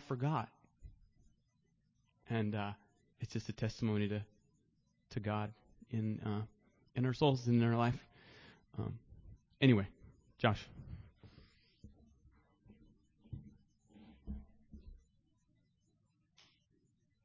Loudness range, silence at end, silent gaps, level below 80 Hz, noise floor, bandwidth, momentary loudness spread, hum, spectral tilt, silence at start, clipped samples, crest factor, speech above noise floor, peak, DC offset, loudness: 22 LU; 2.3 s; none; -62 dBFS; -77 dBFS; 7.4 kHz; 22 LU; none; -7.5 dB/octave; 0 s; under 0.1%; 24 dB; 42 dB; -16 dBFS; under 0.1%; -37 LUFS